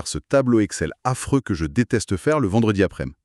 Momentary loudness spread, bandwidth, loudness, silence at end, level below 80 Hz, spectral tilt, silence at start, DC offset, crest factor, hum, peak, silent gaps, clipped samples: 6 LU; 13 kHz; -21 LUFS; 0.1 s; -42 dBFS; -6 dB/octave; 0 s; under 0.1%; 16 dB; none; -6 dBFS; none; under 0.1%